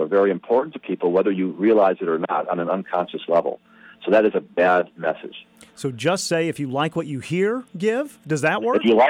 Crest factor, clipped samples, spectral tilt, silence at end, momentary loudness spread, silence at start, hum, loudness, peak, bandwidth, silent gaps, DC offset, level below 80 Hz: 16 dB; under 0.1%; -5.5 dB/octave; 0 s; 10 LU; 0 s; none; -21 LUFS; -6 dBFS; 15.5 kHz; none; under 0.1%; -66 dBFS